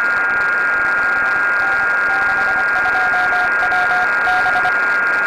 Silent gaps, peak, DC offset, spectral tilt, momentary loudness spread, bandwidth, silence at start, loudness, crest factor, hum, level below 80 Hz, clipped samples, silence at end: none; -10 dBFS; under 0.1%; -3 dB/octave; 1 LU; 14.5 kHz; 0 s; -14 LUFS; 6 dB; none; -48 dBFS; under 0.1%; 0 s